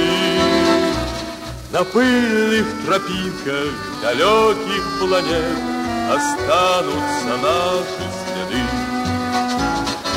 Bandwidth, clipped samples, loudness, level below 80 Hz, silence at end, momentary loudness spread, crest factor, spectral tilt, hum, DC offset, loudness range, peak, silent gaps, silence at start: 16 kHz; under 0.1%; -18 LUFS; -40 dBFS; 0 s; 8 LU; 16 dB; -4 dB/octave; none; under 0.1%; 2 LU; -4 dBFS; none; 0 s